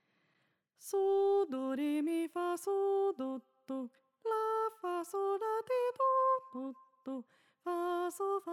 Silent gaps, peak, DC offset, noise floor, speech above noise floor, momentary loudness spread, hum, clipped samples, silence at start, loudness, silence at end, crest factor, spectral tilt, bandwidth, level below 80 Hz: none; -22 dBFS; under 0.1%; -78 dBFS; 42 dB; 14 LU; none; under 0.1%; 0.8 s; -35 LUFS; 0 s; 12 dB; -3.5 dB/octave; 15 kHz; under -90 dBFS